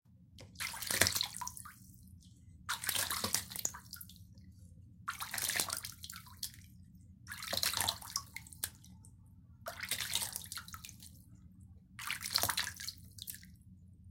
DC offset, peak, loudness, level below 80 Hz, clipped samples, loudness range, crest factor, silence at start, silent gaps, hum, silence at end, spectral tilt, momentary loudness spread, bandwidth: under 0.1%; -6 dBFS; -37 LUFS; -64 dBFS; under 0.1%; 5 LU; 36 dB; 0.1 s; none; none; 0 s; -0.5 dB/octave; 25 LU; 17 kHz